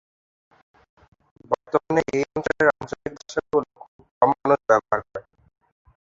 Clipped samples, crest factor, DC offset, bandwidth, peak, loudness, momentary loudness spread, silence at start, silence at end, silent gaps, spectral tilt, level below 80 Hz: under 0.1%; 22 dB; under 0.1%; 7.8 kHz; -2 dBFS; -23 LUFS; 14 LU; 1.5 s; 0.85 s; 3.88-3.99 s, 4.11-4.21 s; -6 dB/octave; -58 dBFS